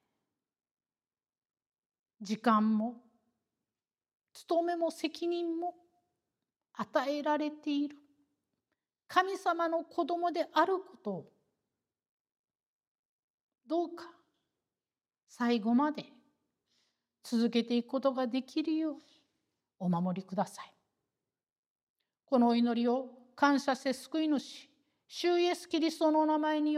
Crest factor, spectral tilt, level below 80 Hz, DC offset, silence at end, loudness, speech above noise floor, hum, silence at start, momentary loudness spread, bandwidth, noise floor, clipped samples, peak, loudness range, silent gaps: 22 dB; -5.5 dB/octave; under -90 dBFS; under 0.1%; 0 s; -32 LUFS; over 59 dB; none; 2.2 s; 13 LU; 14 kHz; under -90 dBFS; under 0.1%; -12 dBFS; 8 LU; 12.09-12.25 s, 12.39-12.44 s, 12.66-12.80 s, 12.87-13.49 s, 21.58-21.96 s